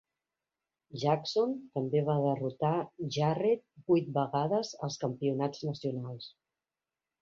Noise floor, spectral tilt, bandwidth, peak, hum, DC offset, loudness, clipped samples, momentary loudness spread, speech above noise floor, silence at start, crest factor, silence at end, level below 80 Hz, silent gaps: under -90 dBFS; -7 dB/octave; 7.6 kHz; -14 dBFS; none; under 0.1%; -32 LUFS; under 0.1%; 8 LU; over 59 dB; 0.95 s; 18 dB; 0.95 s; -74 dBFS; none